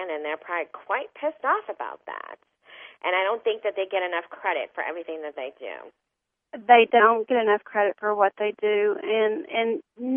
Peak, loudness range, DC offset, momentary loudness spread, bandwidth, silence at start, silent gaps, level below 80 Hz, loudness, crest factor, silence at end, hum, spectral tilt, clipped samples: -4 dBFS; 8 LU; under 0.1%; 17 LU; 3.7 kHz; 0 s; none; -78 dBFS; -24 LUFS; 22 dB; 0 s; none; -7.5 dB/octave; under 0.1%